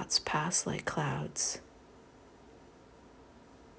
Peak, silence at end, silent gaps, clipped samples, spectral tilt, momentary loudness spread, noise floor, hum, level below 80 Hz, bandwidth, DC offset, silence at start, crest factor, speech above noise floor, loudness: -16 dBFS; 0 s; none; under 0.1%; -2.5 dB/octave; 5 LU; -57 dBFS; none; -62 dBFS; 8 kHz; under 0.1%; 0 s; 22 dB; 23 dB; -32 LUFS